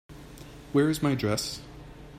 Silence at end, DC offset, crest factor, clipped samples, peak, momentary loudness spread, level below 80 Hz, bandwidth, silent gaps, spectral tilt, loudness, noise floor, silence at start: 0 s; under 0.1%; 18 dB; under 0.1%; -12 dBFS; 21 LU; -52 dBFS; 16 kHz; none; -5.5 dB/octave; -27 LUFS; -46 dBFS; 0.1 s